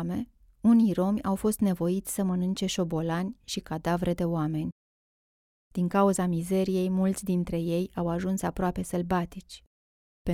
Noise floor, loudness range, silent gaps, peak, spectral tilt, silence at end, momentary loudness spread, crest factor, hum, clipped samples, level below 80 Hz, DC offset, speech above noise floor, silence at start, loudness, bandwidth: under -90 dBFS; 4 LU; 4.72-5.71 s, 9.67-10.25 s; -12 dBFS; -6.5 dB/octave; 0 s; 12 LU; 16 dB; none; under 0.1%; -50 dBFS; under 0.1%; over 63 dB; 0 s; -28 LUFS; 16 kHz